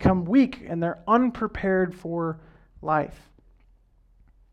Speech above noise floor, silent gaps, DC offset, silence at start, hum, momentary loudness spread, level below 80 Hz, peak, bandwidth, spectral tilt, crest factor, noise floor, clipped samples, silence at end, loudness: 34 dB; none; under 0.1%; 0 s; none; 11 LU; -48 dBFS; -6 dBFS; 7 kHz; -9 dB/octave; 18 dB; -59 dBFS; under 0.1%; 1.4 s; -25 LUFS